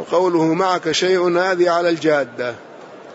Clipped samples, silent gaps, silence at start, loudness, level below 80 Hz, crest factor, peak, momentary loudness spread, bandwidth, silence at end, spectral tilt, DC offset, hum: under 0.1%; none; 0 s; -17 LUFS; -66 dBFS; 14 dB; -4 dBFS; 10 LU; 8 kHz; 0 s; -4.5 dB/octave; under 0.1%; none